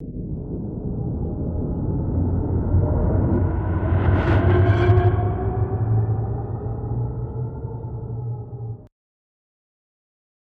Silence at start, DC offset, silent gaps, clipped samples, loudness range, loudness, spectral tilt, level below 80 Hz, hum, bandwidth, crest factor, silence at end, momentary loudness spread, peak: 0 s; under 0.1%; none; under 0.1%; 11 LU; -23 LUFS; -10.5 dB/octave; -32 dBFS; none; 4.4 kHz; 16 dB; 1.6 s; 14 LU; -6 dBFS